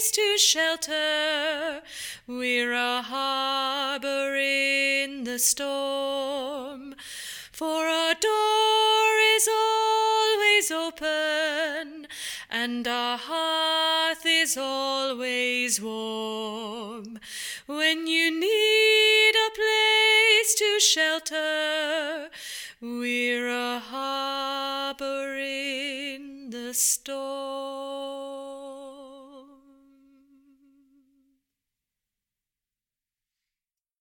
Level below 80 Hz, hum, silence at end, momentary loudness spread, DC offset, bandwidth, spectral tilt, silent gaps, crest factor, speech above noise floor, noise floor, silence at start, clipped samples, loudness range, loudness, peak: -70 dBFS; none; 4.55 s; 17 LU; under 0.1%; 18 kHz; 0.5 dB/octave; none; 20 dB; over 64 dB; under -90 dBFS; 0 s; under 0.1%; 10 LU; -23 LUFS; -6 dBFS